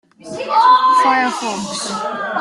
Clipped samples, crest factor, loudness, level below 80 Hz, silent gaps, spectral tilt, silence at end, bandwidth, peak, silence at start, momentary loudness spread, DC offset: under 0.1%; 14 dB; -15 LUFS; -64 dBFS; none; -2.5 dB/octave; 0 s; 12 kHz; -2 dBFS; 0.25 s; 12 LU; under 0.1%